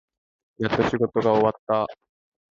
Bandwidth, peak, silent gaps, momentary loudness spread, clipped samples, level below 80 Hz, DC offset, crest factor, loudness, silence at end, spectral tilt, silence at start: 7.4 kHz; -6 dBFS; 1.59-1.67 s; 8 LU; under 0.1%; -54 dBFS; under 0.1%; 18 dB; -23 LUFS; 0.55 s; -7 dB/octave; 0.6 s